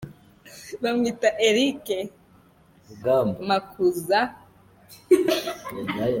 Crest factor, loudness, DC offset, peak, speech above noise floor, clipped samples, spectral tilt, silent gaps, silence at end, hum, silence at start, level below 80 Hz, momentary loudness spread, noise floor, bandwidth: 20 dB; -24 LUFS; under 0.1%; -6 dBFS; 33 dB; under 0.1%; -4.5 dB/octave; none; 0 s; none; 0 s; -60 dBFS; 12 LU; -56 dBFS; 17 kHz